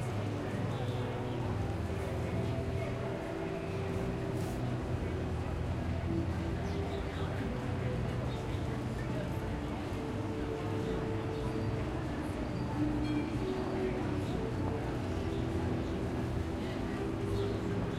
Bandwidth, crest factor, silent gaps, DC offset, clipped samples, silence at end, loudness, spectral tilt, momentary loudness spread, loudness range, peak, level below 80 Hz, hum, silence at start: 14.5 kHz; 14 dB; none; under 0.1%; under 0.1%; 0 s; -36 LUFS; -7.5 dB/octave; 3 LU; 2 LU; -22 dBFS; -46 dBFS; none; 0 s